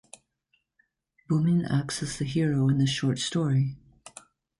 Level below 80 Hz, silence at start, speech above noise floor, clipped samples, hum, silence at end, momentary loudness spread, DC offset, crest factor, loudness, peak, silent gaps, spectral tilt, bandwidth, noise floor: -58 dBFS; 1.3 s; 48 dB; under 0.1%; none; 0.85 s; 22 LU; under 0.1%; 14 dB; -26 LUFS; -14 dBFS; none; -6 dB/octave; 11.5 kHz; -74 dBFS